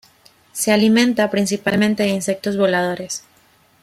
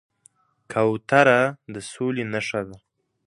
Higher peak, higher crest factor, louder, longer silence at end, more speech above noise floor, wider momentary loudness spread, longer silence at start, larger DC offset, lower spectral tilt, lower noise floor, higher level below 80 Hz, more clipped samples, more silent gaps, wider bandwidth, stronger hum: about the same, -2 dBFS vs 0 dBFS; second, 16 dB vs 24 dB; first, -18 LUFS vs -22 LUFS; first, 0.65 s vs 0.5 s; about the same, 38 dB vs 38 dB; second, 12 LU vs 18 LU; second, 0.55 s vs 0.7 s; neither; about the same, -4.5 dB/octave vs -5.5 dB/octave; second, -55 dBFS vs -60 dBFS; about the same, -60 dBFS vs -62 dBFS; neither; neither; first, 15.5 kHz vs 11.5 kHz; neither